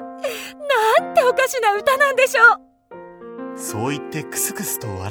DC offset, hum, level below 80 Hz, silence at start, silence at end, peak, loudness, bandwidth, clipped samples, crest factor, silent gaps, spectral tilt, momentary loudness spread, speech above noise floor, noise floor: under 0.1%; none; -64 dBFS; 0 s; 0 s; 0 dBFS; -18 LUFS; over 20 kHz; under 0.1%; 20 dB; none; -3 dB/octave; 17 LU; 22 dB; -41 dBFS